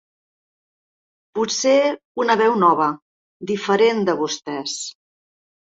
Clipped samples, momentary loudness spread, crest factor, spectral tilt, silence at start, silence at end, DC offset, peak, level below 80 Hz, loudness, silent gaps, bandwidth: under 0.1%; 14 LU; 18 dB; -3.5 dB/octave; 1.35 s; 0.85 s; under 0.1%; -2 dBFS; -68 dBFS; -19 LUFS; 2.05-2.15 s, 3.02-3.40 s; 8 kHz